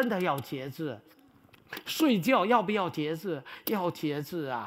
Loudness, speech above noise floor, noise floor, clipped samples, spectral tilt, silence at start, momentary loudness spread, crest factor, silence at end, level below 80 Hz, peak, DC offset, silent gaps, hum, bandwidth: -30 LUFS; 29 dB; -59 dBFS; under 0.1%; -5.5 dB/octave; 0 s; 14 LU; 20 dB; 0 s; -74 dBFS; -10 dBFS; under 0.1%; none; none; 16 kHz